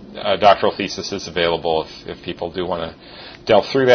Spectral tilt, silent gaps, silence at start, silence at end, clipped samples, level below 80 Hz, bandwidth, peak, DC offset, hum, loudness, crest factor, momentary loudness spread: -4.5 dB/octave; none; 0 s; 0 s; under 0.1%; -50 dBFS; 6.6 kHz; 0 dBFS; under 0.1%; none; -19 LUFS; 18 dB; 17 LU